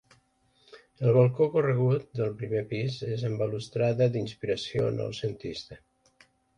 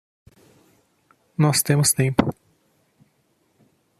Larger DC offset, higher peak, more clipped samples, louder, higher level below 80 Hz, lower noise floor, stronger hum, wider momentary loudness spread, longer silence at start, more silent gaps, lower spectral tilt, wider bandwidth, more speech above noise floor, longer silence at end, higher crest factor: neither; second, -10 dBFS vs 0 dBFS; neither; second, -28 LUFS vs -20 LUFS; about the same, -60 dBFS vs -56 dBFS; about the same, -67 dBFS vs -66 dBFS; neither; about the same, 11 LU vs 10 LU; second, 0.75 s vs 1.4 s; neither; first, -7.5 dB/octave vs -4.5 dB/octave; second, 9.8 kHz vs 14.5 kHz; second, 40 dB vs 47 dB; second, 0.8 s vs 1.7 s; about the same, 20 dB vs 24 dB